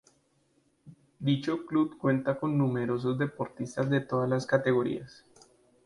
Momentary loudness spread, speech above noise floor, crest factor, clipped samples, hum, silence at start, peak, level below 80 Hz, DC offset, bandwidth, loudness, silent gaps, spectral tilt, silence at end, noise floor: 7 LU; 41 dB; 20 dB; under 0.1%; none; 0.85 s; -10 dBFS; -66 dBFS; under 0.1%; 11.5 kHz; -29 LUFS; none; -7.5 dB/octave; 0.75 s; -70 dBFS